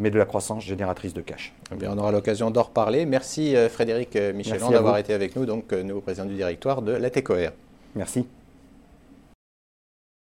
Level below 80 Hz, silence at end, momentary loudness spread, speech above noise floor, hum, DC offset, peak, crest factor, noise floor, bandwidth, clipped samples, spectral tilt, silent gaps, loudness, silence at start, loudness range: -56 dBFS; 1.95 s; 13 LU; 28 dB; none; under 0.1%; -4 dBFS; 20 dB; -52 dBFS; 16 kHz; under 0.1%; -6 dB/octave; none; -25 LUFS; 0 s; 6 LU